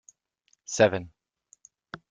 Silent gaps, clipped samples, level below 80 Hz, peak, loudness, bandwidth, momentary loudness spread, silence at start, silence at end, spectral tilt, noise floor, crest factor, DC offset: none; under 0.1%; -66 dBFS; -6 dBFS; -25 LUFS; 9.4 kHz; 25 LU; 0.7 s; 0.15 s; -4 dB/octave; -71 dBFS; 26 dB; under 0.1%